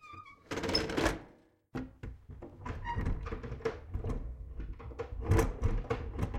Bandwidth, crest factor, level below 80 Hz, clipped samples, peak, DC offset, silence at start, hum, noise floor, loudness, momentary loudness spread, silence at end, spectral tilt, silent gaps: 16.5 kHz; 22 dB; -40 dBFS; under 0.1%; -14 dBFS; under 0.1%; 0 s; none; -62 dBFS; -37 LUFS; 17 LU; 0 s; -5.5 dB/octave; none